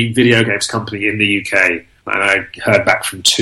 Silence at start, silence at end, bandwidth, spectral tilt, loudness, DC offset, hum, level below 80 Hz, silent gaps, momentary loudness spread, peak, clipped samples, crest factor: 0 s; 0 s; 16 kHz; -3.5 dB/octave; -14 LUFS; under 0.1%; none; -50 dBFS; none; 7 LU; 0 dBFS; under 0.1%; 14 dB